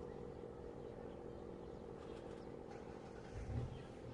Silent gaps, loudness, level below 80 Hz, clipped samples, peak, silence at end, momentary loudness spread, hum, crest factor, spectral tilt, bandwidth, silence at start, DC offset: none; -51 LUFS; -60 dBFS; under 0.1%; -30 dBFS; 0 s; 6 LU; none; 20 dB; -7.5 dB/octave; 11 kHz; 0 s; under 0.1%